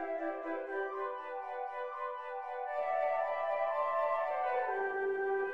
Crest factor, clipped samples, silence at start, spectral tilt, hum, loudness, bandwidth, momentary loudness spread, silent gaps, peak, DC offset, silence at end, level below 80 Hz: 14 dB; under 0.1%; 0 s; -5 dB/octave; none; -36 LUFS; 6 kHz; 8 LU; none; -22 dBFS; under 0.1%; 0 s; -80 dBFS